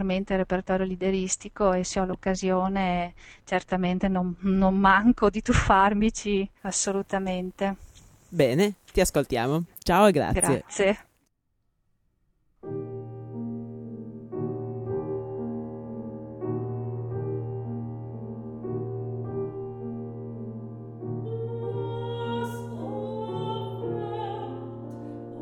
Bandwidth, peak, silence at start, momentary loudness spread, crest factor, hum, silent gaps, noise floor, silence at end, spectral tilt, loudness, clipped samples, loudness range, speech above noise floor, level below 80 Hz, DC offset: 16.5 kHz; -6 dBFS; 0 s; 17 LU; 22 dB; none; none; -73 dBFS; 0 s; -5 dB/octave; -27 LUFS; under 0.1%; 12 LU; 49 dB; -44 dBFS; under 0.1%